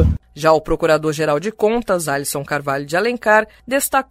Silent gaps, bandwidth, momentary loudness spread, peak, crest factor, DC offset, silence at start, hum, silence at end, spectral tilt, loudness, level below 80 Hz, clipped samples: none; 16 kHz; 6 LU; 0 dBFS; 16 dB; under 0.1%; 0 s; none; 0.05 s; -4.5 dB/octave; -18 LUFS; -32 dBFS; under 0.1%